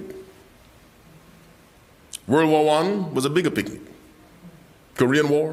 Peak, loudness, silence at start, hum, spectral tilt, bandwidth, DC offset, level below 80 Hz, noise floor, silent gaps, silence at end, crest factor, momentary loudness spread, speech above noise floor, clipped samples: -4 dBFS; -21 LUFS; 0 s; none; -5.5 dB/octave; 15.5 kHz; under 0.1%; -58 dBFS; -52 dBFS; none; 0 s; 20 dB; 22 LU; 32 dB; under 0.1%